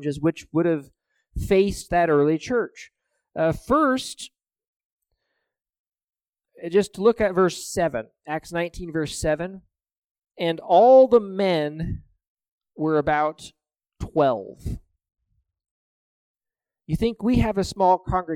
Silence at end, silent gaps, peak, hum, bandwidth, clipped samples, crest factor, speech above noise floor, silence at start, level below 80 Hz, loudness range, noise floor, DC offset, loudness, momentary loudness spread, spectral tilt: 0 s; 4.68-4.98 s, 5.79-5.85 s, 9.98-10.15 s, 12.27-12.37 s, 12.48-12.61 s, 15.71-16.34 s; -4 dBFS; none; 16 kHz; under 0.1%; 18 dB; 68 dB; 0 s; -42 dBFS; 8 LU; -90 dBFS; under 0.1%; -22 LUFS; 15 LU; -6 dB/octave